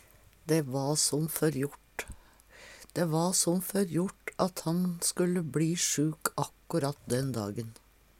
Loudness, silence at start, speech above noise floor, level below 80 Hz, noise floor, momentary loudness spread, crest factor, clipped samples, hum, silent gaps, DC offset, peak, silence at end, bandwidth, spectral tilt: -30 LUFS; 0.45 s; 25 dB; -62 dBFS; -55 dBFS; 15 LU; 22 dB; under 0.1%; none; none; under 0.1%; -8 dBFS; 0.45 s; 17.5 kHz; -4.5 dB/octave